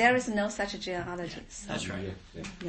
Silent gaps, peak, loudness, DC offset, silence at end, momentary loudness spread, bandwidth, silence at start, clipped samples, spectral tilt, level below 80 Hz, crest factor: none; -10 dBFS; -33 LUFS; under 0.1%; 0 s; 13 LU; 8.8 kHz; 0 s; under 0.1%; -4 dB/octave; -54 dBFS; 20 dB